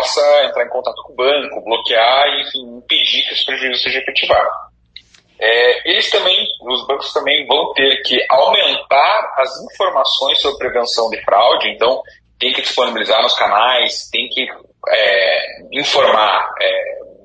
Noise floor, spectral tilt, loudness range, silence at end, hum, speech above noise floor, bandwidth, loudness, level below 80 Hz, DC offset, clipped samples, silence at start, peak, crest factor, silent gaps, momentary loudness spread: -43 dBFS; -1 dB/octave; 2 LU; 0.15 s; none; 28 dB; 9.4 kHz; -14 LUFS; -54 dBFS; under 0.1%; under 0.1%; 0 s; 0 dBFS; 14 dB; none; 8 LU